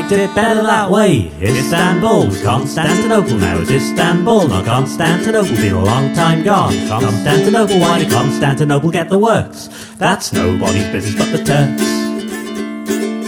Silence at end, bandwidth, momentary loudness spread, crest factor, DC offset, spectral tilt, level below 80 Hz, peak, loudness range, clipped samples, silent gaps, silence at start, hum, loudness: 0 s; 19.5 kHz; 7 LU; 14 dB; under 0.1%; -5.5 dB/octave; -42 dBFS; 0 dBFS; 2 LU; under 0.1%; none; 0 s; none; -13 LUFS